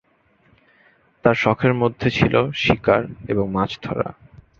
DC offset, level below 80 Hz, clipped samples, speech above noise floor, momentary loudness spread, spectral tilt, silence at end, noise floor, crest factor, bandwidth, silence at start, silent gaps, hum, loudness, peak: under 0.1%; -44 dBFS; under 0.1%; 40 dB; 8 LU; -7 dB/octave; 0.45 s; -60 dBFS; 20 dB; 7.4 kHz; 1.25 s; none; none; -20 LUFS; -2 dBFS